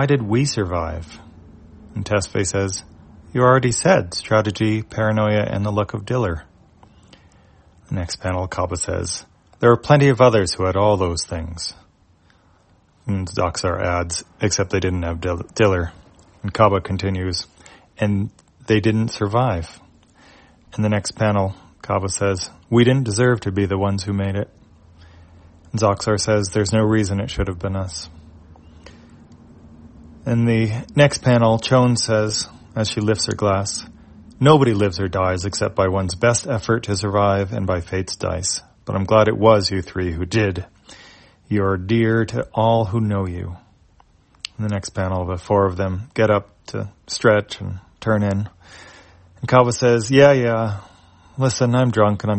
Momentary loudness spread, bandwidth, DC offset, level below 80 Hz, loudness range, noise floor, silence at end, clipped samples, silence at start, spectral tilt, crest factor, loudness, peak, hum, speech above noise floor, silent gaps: 14 LU; 8.8 kHz; under 0.1%; -46 dBFS; 6 LU; -56 dBFS; 0 s; under 0.1%; 0 s; -5.5 dB/octave; 20 dB; -19 LUFS; 0 dBFS; none; 37 dB; none